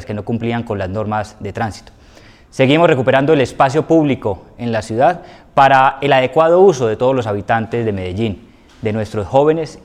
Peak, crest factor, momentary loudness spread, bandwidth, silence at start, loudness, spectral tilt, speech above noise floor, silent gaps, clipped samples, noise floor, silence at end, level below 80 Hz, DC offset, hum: 0 dBFS; 14 dB; 12 LU; 11 kHz; 0 s; -15 LUFS; -6.5 dB/octave; 28 dB; none; under 0.1%; -43 dBFS; 0.05 s; -46 dBFS; under 0.1%; none